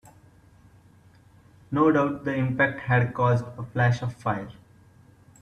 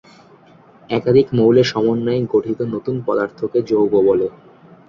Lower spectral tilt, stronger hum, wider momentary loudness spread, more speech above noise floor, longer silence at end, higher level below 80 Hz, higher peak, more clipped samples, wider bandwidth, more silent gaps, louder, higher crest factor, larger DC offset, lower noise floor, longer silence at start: about the same, -8 dB/octave vs -7.5 dB/octave; neither; about the same, 10 LU vs 9 LU; about the same, 31 dB vs 31 dB; first, 0.9 s vs 0.6 s; about the same, -58 dBFS vs -54 dBFS; second, -8 dBFS vs -2 dBFS; neither; first, 8.6 kHz vs 7.2 kHz; neither; second, -25 LUFS vs -17 LUFS; about the same, 18 dB vs 16 dB; neither; first, -55 dBFS vs -47 dBFS; first, 1.7 s vs 0.9 s